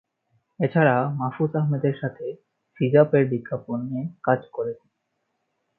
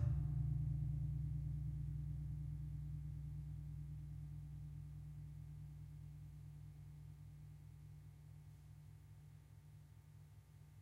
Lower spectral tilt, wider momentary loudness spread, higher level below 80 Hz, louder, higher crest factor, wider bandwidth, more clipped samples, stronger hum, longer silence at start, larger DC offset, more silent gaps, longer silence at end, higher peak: first, -12 dB/octave vs -9.5 dB/octave; second, 12 LU vs 20 LU; second, -68 dBFS vs -54 dBFS; first, -23 LUFS vs -48 LUFS; about the same, 20 dB vs 18 dB; second, 4.2 kHz vs 11 kHz; neither; neither; first, 0.6 s vs 0 s; neither; neither; first, 1.05 s vs 0 s; first, -4 dBFS vs -28 dBFS